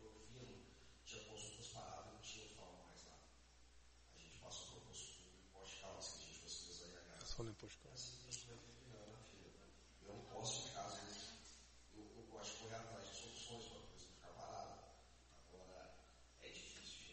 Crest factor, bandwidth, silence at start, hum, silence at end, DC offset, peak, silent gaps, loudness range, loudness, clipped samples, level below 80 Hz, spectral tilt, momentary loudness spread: 26 dB; 8.4 kHz; 0 s; none; 0 s; under 0.1%; -32 dBFS; none; 6 LU; -55 LUFS; under 0.1%; -68 dBFS; -2.5 dB/octave; 14 LU